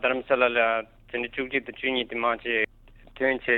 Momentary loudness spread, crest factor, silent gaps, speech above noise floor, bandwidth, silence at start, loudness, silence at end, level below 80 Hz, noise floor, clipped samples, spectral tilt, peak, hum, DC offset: 9 LU; 18 dB; none; 26 dB; 4.3 kHz; 0 s; -26 LUFS; 0 s; -54 dBFS; -52 dBFS; under 0.1%; -6.5 dB/octave; -8 dBFS; none; under 0.1%